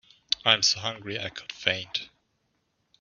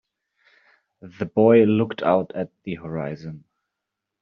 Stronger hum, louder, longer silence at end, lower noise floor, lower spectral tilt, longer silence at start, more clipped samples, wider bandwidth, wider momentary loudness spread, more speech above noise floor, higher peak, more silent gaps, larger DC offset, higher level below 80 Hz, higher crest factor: neither; second, -26 LUFS vs -21 LUFS; about the same, 0.95 s vs 0.85 s; second, -74 dBFS vs -83 dBFS; second, 0 dB/octave vs -7 dB/octave; second, 0.3 s vs 1.05 s; neither; first, 7.2 kHz vs 6 kHz; second, 13 LU vs 18 LU; second, 46 dB vs 62 dB; about the same, -4 dBFS vs -4 dBFS; neither; neither; about the same, -68 dBFS vs -64 dBFS; first, 26 dB vs 18 dB